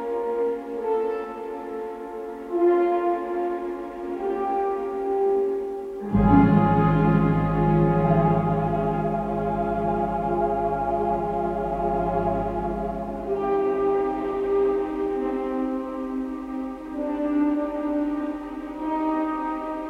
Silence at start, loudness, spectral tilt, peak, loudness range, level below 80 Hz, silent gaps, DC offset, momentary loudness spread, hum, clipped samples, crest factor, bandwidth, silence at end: 0 s; -24 LUFS; -10 dB/octave; -4 dBFS; 6 LU; -40 dBFS; none; under 0.1%; 11 LU; none; under 0.1%; 18 dB; 5.4 kHz; 0 s